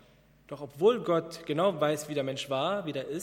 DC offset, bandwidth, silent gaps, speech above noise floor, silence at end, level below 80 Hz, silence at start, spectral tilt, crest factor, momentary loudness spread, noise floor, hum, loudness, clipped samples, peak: under 0.1%; 16.5 kHz; none; 30 dB; 0 s; -68 dBFS; 0.5 s; -5 dB/octave; 18 dB; 12 LU; -59 dBFS; none; -29 LUFS; under 0.1%; -12 dBFS